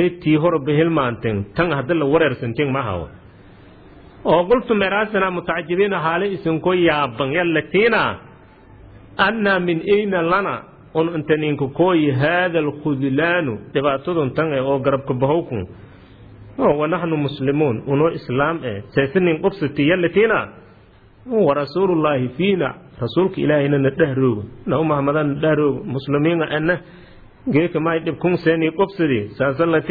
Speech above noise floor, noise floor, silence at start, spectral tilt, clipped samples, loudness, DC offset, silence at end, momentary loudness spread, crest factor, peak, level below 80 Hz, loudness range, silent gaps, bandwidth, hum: 30 dB; -48 dBFS; 0 s; -10 dB/octave; under 0.1%; -19 LUFS; under 0.1%; 0 s; 7 LU; 18 dB; -2 dBFS; -48 dBFS; 2 LU; none; 4.9 kHz; none